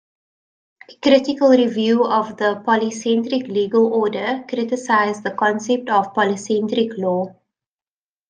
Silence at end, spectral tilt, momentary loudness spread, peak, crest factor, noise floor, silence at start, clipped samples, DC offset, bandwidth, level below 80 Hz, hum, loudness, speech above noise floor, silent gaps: 1 s; -5 dB/octave; 7 LU; -2 dBFS; 16 dB; under -90 dBFS; 0.9 s; under 0.1%; under 0.1%; 9.6 kHz; -66 dBFS; none; -18 LUFS; over 72 dB; none